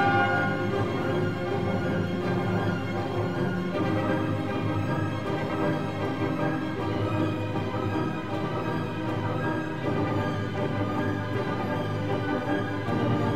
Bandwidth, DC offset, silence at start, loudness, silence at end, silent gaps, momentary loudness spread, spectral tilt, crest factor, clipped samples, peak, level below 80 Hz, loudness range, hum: 14.5 kHz; 0.6%; 0 s; -28 LUFS; 0 s; none; 3 LU; -7.5 dB/octave; 16 dB; under 0.1%; -12 dBFS; -52 dBFS; 1 LU; none